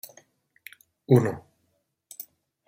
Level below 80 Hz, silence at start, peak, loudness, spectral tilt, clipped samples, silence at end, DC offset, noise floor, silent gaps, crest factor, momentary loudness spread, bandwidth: -66 dBFS; 1.1 s; -6 dBFS; -23 LUFS; -8 dB/octave; under 0.1%; 1.3 s; under 0.1%; -74 dBFS; none; 24 dB; 26 LU; 16 kHz